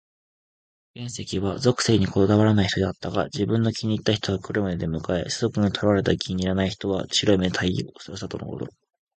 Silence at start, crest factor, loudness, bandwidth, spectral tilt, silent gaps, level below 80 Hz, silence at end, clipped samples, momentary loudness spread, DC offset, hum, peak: 0.95 s; 20 dB; -23 LUFS; 9.2 kHz; -5.5 dB/octave; none; -44 dBFS; 0.5 s; under 0.1%; 13 LU; under 0.1%; none; -4 dBFS